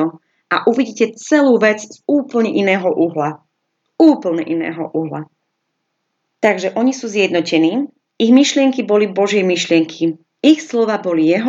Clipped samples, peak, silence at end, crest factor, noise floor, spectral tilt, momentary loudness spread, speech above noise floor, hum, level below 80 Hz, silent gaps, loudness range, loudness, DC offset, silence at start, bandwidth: under 0.1%; 0 dBFS; 0 s; 16 dB; -72 dBFS; -5 dB/octave; 10 LU; 57 dB; none; -78 dBFS; none; 5 LU; -15 LUFS; under 0.1%; 0 s; 7.8 kHz